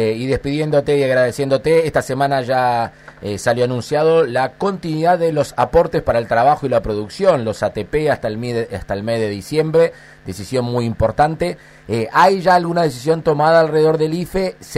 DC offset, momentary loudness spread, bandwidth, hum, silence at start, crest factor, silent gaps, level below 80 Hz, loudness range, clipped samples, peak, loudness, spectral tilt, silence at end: under 0.1%; 9 LU; 15 kHz; none; 0 s; 14 dB; none; -40 dBFS; 4 LU; under 0.1%; -2 dBFS; -17 LUFS; -6 dB/octave; 0 s